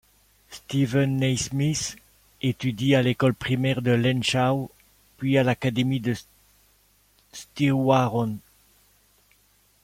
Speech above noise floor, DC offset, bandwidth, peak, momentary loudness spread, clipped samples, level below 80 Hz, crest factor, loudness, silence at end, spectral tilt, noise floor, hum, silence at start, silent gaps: 39 dB; under 0.1%; 15.5 kHz; -6 dBFS; 13 LU; under 0.1%; -56 dBFS; 20 dB; -24 LUFS; 1.45 s; -5.5 dB/octave; -62 dBFS; 50 Hz at -60 dBFS; 0.5 s; none